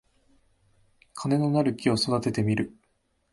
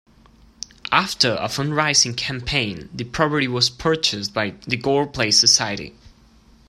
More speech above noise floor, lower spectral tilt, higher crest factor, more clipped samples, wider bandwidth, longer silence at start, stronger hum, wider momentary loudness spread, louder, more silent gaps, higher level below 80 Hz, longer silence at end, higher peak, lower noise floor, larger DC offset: first, 46 dB vs 31 dB; first, -6 dB/octave vs -2.5 dB/octave; about the same, 20 dB vs 22 dB; neither; second, 11.5 kHz vs 15.5 kHz; first, 1.15 s vs 0.9 s; neither; second, 11 LU vs 16 LU; second, -26 LUFS vs -19 LUFS; neither; second, -58 dBFS vs -46 dBFS; second, 0.65 s vs 0.8 s; second, -10 dBFS vs 0 dBFS; first, -71 dBFS vs -52 dBFS; neither